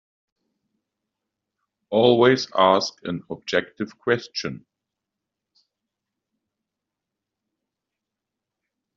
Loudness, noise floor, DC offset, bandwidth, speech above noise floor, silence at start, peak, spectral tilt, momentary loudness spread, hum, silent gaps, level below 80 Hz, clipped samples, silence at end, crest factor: -21 LUFS; -85 dBFS; under 0.1%; 7.4 kHz; 64 dB; 1.9 s; -2 dBFS; -3.5 dB/octave; 16 LU; none; none; -68 dBFS; under 0.1%; 4.4 s; 24 dB